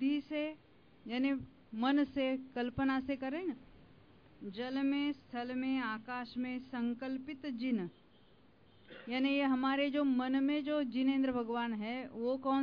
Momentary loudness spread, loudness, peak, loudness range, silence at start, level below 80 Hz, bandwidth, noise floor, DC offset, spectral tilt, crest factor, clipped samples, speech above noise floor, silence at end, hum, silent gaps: 11 LU; -36 LUFS; -20 dBFS; 5 LU; 0 s; -68 dBFS; 5.2 kHz; -65 dBFS; under 0.1%; -7.5 dB/octave; 16 dB; under 0.1%; 30 dB; 0 s; none; none